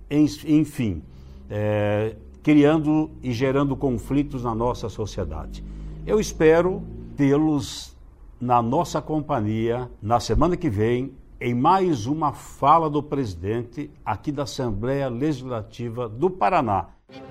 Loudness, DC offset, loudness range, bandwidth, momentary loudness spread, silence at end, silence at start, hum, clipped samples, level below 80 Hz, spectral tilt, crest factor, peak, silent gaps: -23 LUFS; under 0.1%; 4 LU; 14.5 kHz; 14 LU; 0 s; 0 s; none; under 0.1%; -40 dBFS; -7 dB/octave; 20 dB; -4 dBFS; none